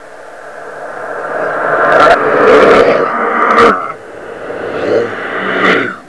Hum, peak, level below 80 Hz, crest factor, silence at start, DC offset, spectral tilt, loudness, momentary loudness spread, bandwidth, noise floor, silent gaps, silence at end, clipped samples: none; 0 dBFS; -44 dBFS; 12 dB; 0 s; 0.9%; -5 dB/octave; -9 LUFS; 20 LU; 11 kHz; -30 dBFS; none; 0.05 s; 0.8%